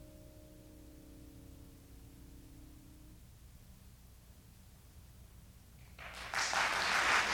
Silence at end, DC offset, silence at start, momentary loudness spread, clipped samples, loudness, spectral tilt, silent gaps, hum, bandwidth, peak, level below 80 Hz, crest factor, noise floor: 0 s; under 0.1%; 0 s; 28 LU; under 0.1%; -33 LUFS; -1 dB/octave; none; none; over 20 kHz; -16 dBFS; -60 dBFS; 24 dB; -59 dBFS